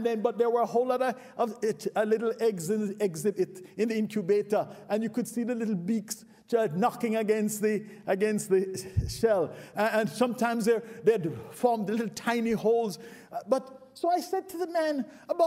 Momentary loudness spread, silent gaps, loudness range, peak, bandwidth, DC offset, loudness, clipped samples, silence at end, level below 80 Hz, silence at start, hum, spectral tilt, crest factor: 6 LU; none; 2 LU; -12 dBFS; 16 kHz; under 0.1%; -29 LUFS; under 0.1%; 0 s; -54 dBFS; 0 s; none; -5.5 dB/octave; 18 dB